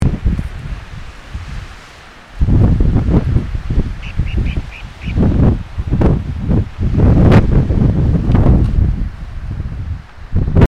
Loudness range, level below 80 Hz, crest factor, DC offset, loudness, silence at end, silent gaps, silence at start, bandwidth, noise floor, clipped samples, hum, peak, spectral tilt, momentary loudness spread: 5 LU; -18 dBFS; 14 dB; under 0.1%; -15 LUFS; 0.15 s; none; 0 s; 7.8 kHz; -37 dBFS; under 0.1%; none; 0 dBFS; -9 dB/octave; 17 LU